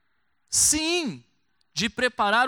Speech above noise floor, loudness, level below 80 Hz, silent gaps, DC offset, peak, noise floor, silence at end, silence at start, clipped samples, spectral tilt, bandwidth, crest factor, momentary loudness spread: 50 dB; -23 LUFS; -54 dBFS; none; under 0.1%; -8 dBFS; -74 dBFS; 0 s; 0.5 s; under 0.1%; -1 dB/octave; 19 kHz; 18 dB; 12 LU